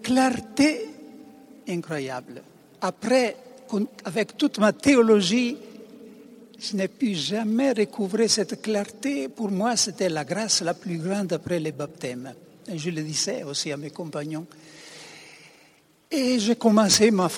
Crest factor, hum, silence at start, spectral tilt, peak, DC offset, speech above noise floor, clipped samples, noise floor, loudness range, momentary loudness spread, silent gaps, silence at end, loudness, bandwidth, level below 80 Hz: 20 dB; none; 0 s; -4 dB/octave; -6 dBFS; under 0.1%; 34 dB; under 0.1%; -58 dBFS; 8 LU; 22 LU; none; 0 s; -24 LUFS; 18 kHz; -64 dBFS